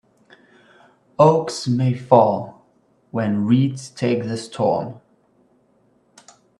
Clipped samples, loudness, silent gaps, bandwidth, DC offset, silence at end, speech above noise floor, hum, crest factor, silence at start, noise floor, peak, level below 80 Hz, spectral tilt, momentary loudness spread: under 0.1%; -19 LUFS; none; 11.5 kHz; under 0.1%; 1.6 s; 42 dB; none; 20 dB; 1.2 s; -60 dBFS; 0 dBFS; -62 dBFS; -7 dB/octave; 14 LU